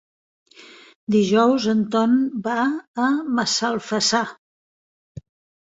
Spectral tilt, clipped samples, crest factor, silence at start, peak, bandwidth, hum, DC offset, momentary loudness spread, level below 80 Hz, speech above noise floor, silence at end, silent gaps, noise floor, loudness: -4 dB/octave; under 0.1%; 18 dB; 0.6 s; -4 dBFS; 8 kHz; none; under 0.1%; 6 LU; -62 dBFS; 27 dB; 1.35 s; 0.96-1.07 s, 2.88-2.94 s; -47 dBFS; -20 LUFS